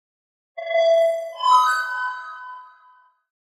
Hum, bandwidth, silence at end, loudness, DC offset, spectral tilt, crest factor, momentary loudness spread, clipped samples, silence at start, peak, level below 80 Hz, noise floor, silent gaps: none; 15 kHz; 0.9 s; -19 LUFS; under 0.1%; 3 dB/octave; 16 dB; 22 LU; under 0.1%; 0.55 s; -6 dBFS; under -90 dBFS; -55 dBFS; none